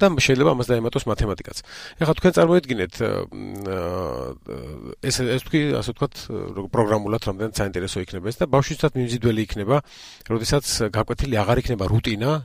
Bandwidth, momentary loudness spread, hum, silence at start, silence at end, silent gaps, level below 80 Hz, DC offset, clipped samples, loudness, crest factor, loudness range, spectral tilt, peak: 16 kHz; 14 LU; none; 0 s; 0 s; none; -38 dBFS; under 0.1%; under 0.1%; -22 LUFS; 18 dB; 4 LU; -5.5 dB/octave; -4 dBFS